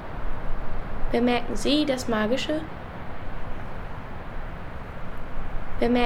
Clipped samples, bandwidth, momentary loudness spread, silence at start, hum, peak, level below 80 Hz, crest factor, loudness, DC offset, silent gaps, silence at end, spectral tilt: under 0.1%; 11.5 kHz; 15 LU; 0 s; none; -8 dBFS; -32 dBFS; 16 dB; -29 LUFS; under 0.1%; none; 0 s; -5 dB/octave